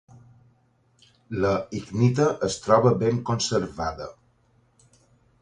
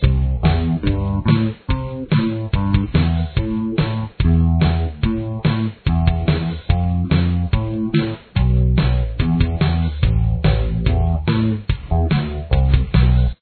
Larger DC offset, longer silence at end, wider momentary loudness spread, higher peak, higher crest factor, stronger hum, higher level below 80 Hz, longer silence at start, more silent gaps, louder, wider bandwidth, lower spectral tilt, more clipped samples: neither; first, 1.3 s vs 0.1 s; first, 12 LU vs 5 LU; second, -6 dBFS vs -2 dBFS; about the same, 20 dB vs 16 dB; neither; second, -52 dBFS vs -22 dBFS; first, 1.3 s vs 0 s; neither; second, -24 LUFS vs -19 LUFS; first, 10 kHz vs 4.5 kHz; second, -6 dB/octave vs -11 dB/octave; neither